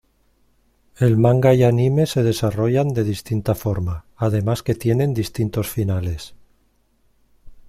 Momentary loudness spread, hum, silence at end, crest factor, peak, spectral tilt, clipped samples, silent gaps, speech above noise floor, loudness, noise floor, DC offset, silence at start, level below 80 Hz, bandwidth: 10 LU; none; 0.1 s; 18 dB; -2 dBFS; -7.5 dB/octave; under 0.1%; none; 43 dB; -19 LUFS; -62 dBFS; under 0.1%; 1 s; -44 dBFS; 15.5 kHz